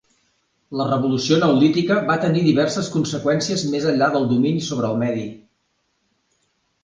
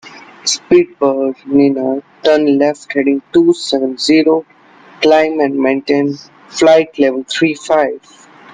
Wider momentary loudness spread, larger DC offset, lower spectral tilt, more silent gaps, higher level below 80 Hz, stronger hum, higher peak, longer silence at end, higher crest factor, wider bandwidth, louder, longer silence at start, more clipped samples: about the same, 6 LU vs 7 LU; neither; first, -5.5 dB/octave vs -4 dB/octave; neither; about the same, -58 dBFS vs -56 dBFS; neither; second, -4 dBFS vs 0 dBFS; first, 1.45 s vs 0.55 s; about the same, 18 dB vs 14 dB; about the same, 9.8 kHz vs 9.6 kHz; second, -19 LUFS vs -13 LUFS; first, 0.7 s vs 0.05 s; neither